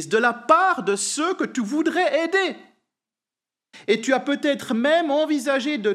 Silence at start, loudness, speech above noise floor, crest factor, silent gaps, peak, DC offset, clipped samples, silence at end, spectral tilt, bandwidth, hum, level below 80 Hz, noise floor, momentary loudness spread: 0 s; -21 LUFS; 68 dB; 20 dB; none; -2 dBFS; under 0.1%; under 0.1%; 0 s; -3 dB/octave; 14 kHz; none; -86 dBFS; -90 dBFS; 6 LU